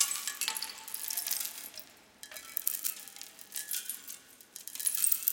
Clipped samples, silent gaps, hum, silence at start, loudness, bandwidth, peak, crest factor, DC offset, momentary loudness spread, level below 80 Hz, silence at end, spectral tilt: under 0.1%; none; none; 0 s; -33 LUFS; 17.5 kHz; -6 dBFS; 32 dB; under 0.1%; 18 LU; -84 dBFS; 0 s; 3 dB/octave